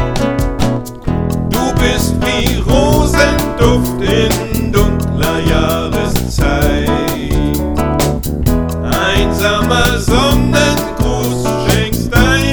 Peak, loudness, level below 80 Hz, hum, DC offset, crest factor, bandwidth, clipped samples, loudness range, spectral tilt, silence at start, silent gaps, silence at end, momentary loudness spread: 0 dBFS; -13 LUFS; -20 dBFS; none; under 0.1%; 12 dB; over 20 kHz; 0.2%; 2 LU; -5 dB/octave; 0 s; none; 0 s; 5 LU